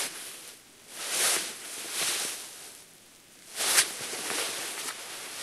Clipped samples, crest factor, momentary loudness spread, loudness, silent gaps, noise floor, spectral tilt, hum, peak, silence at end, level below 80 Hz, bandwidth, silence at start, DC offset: under 0.1%; 28 dB; 20 LU; -29 LUFS; none; -54 dBFS; 1.5 dB/octave; none; -4 dBFS; 0 s; -78 dBFS; 16 kHz; 0 s; under 0.1%